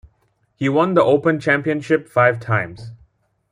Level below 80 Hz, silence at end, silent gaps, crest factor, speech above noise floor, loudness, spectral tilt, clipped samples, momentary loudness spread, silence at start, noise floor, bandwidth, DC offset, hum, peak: -56 dBFS; 0.55 s; none; 16 dB; 46 dB; -18 LUFS; -7.5 dB/octave; under 0.1%; 8 LU; 0.6 s; -64 dBFS; 11 kHz; under 0.1%; none; -2 dBFS